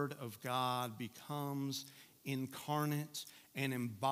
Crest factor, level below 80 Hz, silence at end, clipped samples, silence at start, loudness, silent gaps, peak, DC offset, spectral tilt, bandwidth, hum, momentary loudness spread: 18 dB; -86 dBFS; 0 s; under 0.1%; 0 s; -41 LUFS; none; -22 dBFS; under 0.1%; -5 dB/octave; 16 kHz; none; 10 LU